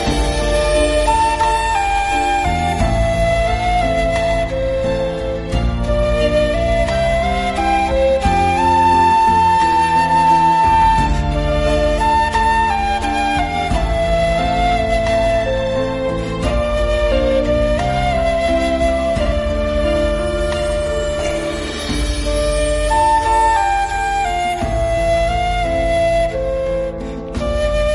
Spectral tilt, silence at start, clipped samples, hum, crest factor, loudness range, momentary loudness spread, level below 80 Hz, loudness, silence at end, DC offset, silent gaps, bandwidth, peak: -5 dB/octave; 0 s; under 0.1%; none; 12 dB; 5 LU; 7 LU; -24 dBFS; -16 LUFS; 0 s; under 0.1%; none; 11.5 kHz; -2 dBFS